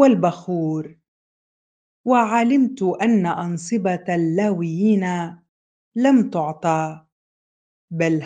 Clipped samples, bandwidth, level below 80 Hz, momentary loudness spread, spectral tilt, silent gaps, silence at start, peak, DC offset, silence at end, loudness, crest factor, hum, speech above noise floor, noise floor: under 0.1%; 9.4 kHz; -68 dBFS; 12 LU; -7 dB/octave; 1.08-2.04 s, 5.49-5.92 s, 7.12-7.88 s; 0 s; 0 dBFS; under 0.1%; 0 s; -20 LUFS; 20 dB; none; over 71 dB; under -90 dBFS